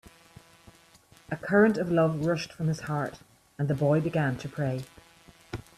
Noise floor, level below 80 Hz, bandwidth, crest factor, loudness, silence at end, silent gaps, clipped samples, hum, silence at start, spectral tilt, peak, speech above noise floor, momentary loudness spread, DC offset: -58 dBFS; -60 dBFS; 13.5 kHz; 20 dB; -28 LUFS; 0.2 s; none; under 0.1%; none; 1.3 s; -7.5 dB/octave; -10 dBFS; 31 dB; 15 LU; under 0.1%